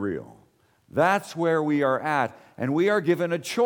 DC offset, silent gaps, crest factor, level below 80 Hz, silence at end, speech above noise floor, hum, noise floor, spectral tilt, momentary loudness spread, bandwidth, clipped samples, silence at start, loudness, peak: under 0.1%; none; 16 dB; -68 dBFS; 0 s; 38 dB; none; -61 dBFS; -6 dB/octave; 9 LU; 19 kHz; under 0.1%; 0 s; -24 LUFS; -8 dBFS